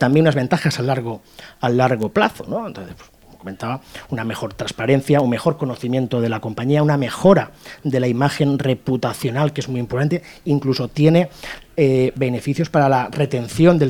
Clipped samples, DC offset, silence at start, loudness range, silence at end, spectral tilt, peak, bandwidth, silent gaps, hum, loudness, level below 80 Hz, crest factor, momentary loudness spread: under 0.1%; under 0.1%; 0 s; 4 LU; 0 s; -7 dB/octave; 0 dBFS; 17.5 kHz; none; none; -19 LUFS; -50 dBFS; 18 dB; 13 LU